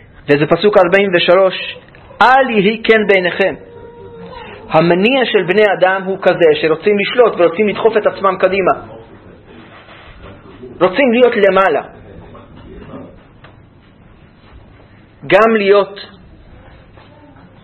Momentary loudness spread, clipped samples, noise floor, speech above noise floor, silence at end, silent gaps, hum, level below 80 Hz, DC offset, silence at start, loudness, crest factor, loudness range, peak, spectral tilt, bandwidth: 21 LU; 0.1%; -43 dBFS; 32 dB; 1.55 s; none; none; -46 dBFS; under 0.1%; 0.25 s; -12 LUFS; 14 dB; 6 LU; 0 dBFS; -7 dB/octave; 6.8 kHz